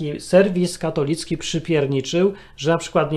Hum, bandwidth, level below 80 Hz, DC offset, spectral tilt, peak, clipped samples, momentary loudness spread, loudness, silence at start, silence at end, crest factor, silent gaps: none; 13.5 kHz; -48 dBFS; under 0.1%; -5.5 dB/octave; -2 dBFS; under 0.1%; 8 LU; -20 LUFS; 0 s; 0 s; 18 dB; none